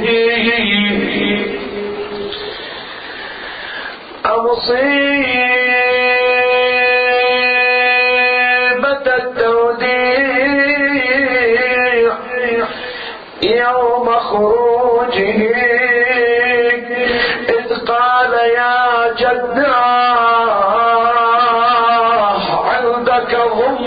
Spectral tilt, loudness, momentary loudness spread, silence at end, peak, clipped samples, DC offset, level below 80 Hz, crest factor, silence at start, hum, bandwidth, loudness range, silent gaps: -7 dB/octave; -13 LUFS; 12 LU; 0 s; -2 dBFS; under 0.1%; under 0.1%; -48 dBFS; 10 dB; 0 s; none; 5 kHz; 6 LU; none